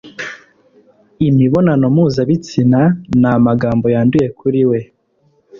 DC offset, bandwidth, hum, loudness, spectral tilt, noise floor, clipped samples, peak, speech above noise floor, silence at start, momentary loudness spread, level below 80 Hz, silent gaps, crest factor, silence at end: under 0.1%; 7.4 kHz; none; -13 LUFS; -8.5 dB/octave; -57 dBFS; under 0.1%; -2 dBFS; 45 dB; 0.05 s; 7 LU; -44 dBFS; none; 12 dB; 0.05 s